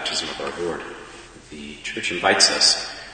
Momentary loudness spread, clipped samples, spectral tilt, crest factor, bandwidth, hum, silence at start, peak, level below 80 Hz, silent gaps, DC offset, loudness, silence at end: 24 LU; under 0.1%; -0.5 dB/octave; 24 dB; 9.4 kHz; none; 0 s; 0 dBFS; -54 dBFS; none; under 0.1%; -19 LUFS; 0 s